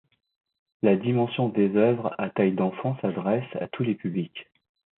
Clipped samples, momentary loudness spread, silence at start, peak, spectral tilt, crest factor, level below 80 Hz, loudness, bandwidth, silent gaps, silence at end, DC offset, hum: under 0.1%; 9 LU; 0.85 s; -8 dBFS; -12 dB/octave; 18 dB; -68 dBFS; -25 LUFS; 4.1 kHz; none; 0.55 s; under 0.1%; none